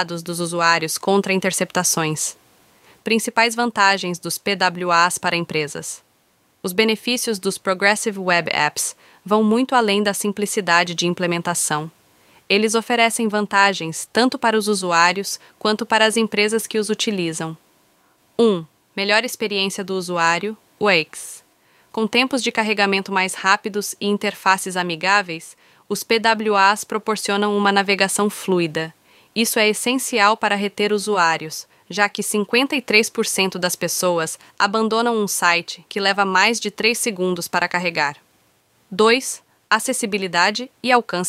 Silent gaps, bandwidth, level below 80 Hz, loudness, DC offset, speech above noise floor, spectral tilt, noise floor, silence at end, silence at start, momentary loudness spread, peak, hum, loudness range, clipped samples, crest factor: none; 16 kHz; -68 dBFS; -19 LUFS; under 0.1%; 42 dB; -3 dB/octave; -61 dBFS; 0 s; 0 s; 9 LU; 0 dBFS; none; 2 LU; under 0.1%; 20 dB